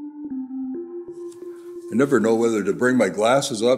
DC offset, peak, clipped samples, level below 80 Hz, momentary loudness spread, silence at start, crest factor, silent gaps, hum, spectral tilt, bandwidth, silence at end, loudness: under 0.1%; -6 dBFS; under 0.1%; -68 dBFS; 18 LU; 0 s; 16 dB; none; none; -5 dB/octave; 15 kHz; 0 s; -21 LUFS